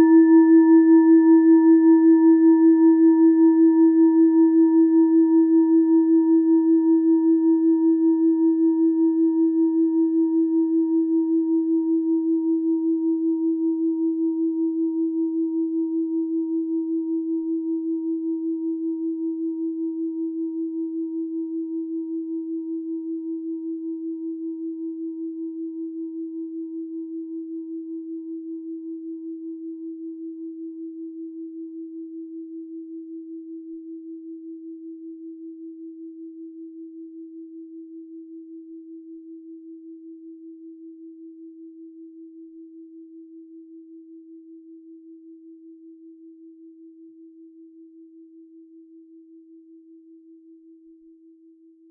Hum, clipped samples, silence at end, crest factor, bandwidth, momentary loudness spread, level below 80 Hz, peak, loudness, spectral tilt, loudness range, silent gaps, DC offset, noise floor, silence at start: none; under 0.1%; 4.65 s; 14 dB; 1.9 kHz; 25 LU; -88 dBFS; -6 dBFS; -20 LUFS; -12 dB/octave; 25 LU; none; under 0.1%; -52 dBFS; 0 s